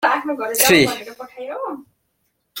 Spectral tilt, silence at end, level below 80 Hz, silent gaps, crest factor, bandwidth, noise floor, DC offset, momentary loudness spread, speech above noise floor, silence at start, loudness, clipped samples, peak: -2.5 dB/octave; 0 s; -54 dBFS; none; 20 dB; 17 kHz; -69 dBFS; under 0.1%; 23 LU; 51 dB; 0 s; -17 LUFS; under 0.1%; 0 dBFS